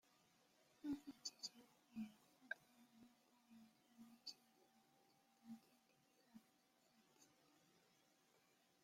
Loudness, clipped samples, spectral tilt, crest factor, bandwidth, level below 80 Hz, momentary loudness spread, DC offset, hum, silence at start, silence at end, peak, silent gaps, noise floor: -56 LUFS; under 0.1%; -2.5 dB/octave; 26 dB; 16 kHz; under -90 dBFS; 17 LU; under 0.1%; none; 0.05 s; 0.45 s; -34 dBFS; none; -79 dBFS